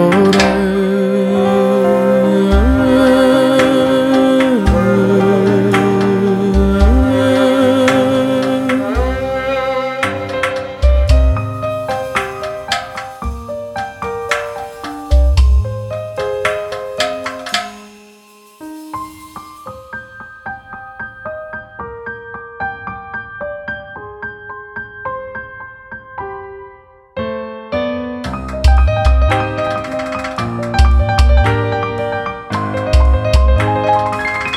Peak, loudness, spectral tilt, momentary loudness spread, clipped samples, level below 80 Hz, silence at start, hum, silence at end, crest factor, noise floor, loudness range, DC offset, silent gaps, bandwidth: 0 dBFS; -14 LUFS; -6.5 dB/octave; 17 LU; under 0.1%; -20 dBFS; 0 s; none; 0 s; 14 dB; -43 dBFS; 16 LU; under 0.1%; none; 12.5 kHz